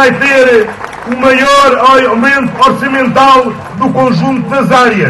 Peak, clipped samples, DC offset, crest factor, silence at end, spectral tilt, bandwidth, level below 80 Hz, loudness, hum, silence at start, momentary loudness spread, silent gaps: 0 dBFS; 2%; under 0.1%; 8 dB; 0 s; -5 dB/octave; 12.5 kHz; -42 dBFS; -7 LUFS; none; 0 s; 8 LU; none